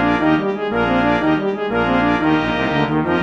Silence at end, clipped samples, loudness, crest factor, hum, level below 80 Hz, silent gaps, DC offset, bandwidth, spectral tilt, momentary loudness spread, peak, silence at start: 0 s; under 0.1%; -17 LUFS; 14 dB; none; -38 dBFS; none; under 0.1%; 7.4 kHz; -7.5 dB/octave; 3 LU; -4 dBFS; 0 s